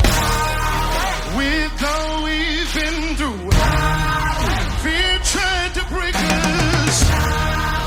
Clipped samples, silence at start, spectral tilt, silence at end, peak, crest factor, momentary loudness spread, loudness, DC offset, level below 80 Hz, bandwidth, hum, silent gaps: under 0.1%; 0 s; -3.5 dB/octave; 0 s; -2 dBFS; 16 dB; 5 LU; -18 LUFS; under 0.1%; -24 dBFS; 19 kHz; none; none